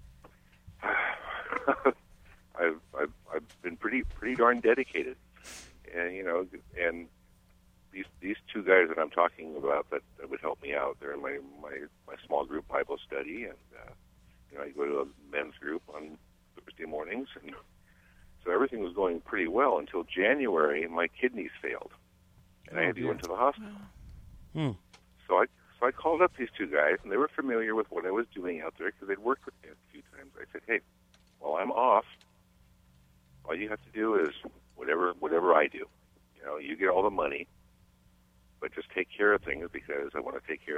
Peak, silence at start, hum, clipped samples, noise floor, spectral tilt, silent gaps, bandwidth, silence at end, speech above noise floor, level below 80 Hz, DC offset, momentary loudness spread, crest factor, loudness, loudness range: -8 dBFS; 0 s; none; under 0.1%; -64 dBFS; -6 dB/octave; none; 14 kHz; 0 s; 33 dB; -58 dBFS; under 0.1%; 18 LU; 24 dB; -31 LUFS; 8 LU